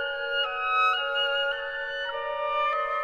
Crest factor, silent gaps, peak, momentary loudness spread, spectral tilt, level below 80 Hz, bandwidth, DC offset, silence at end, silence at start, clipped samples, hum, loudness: 12 dB; none; -14 dBFS; 8 LU; -0.5 dB/octave; -60 dBFS; 12 kHz; under 0.1%; 0 s; 0 s; under 0.1%; none; -26 LUFS